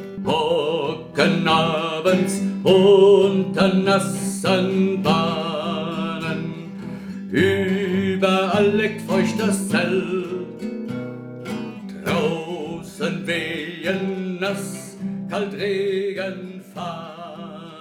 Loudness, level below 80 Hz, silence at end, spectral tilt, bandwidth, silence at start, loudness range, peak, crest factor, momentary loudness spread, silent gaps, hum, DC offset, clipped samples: -21 LUFS; -58 dBFS; 0 s; -5.5 dB/octave; 15.5 kHz; 0 s; 9 LU; -4 dBFS; 18 dB; 15 LU; none; none; under 0.1%; under 0.1%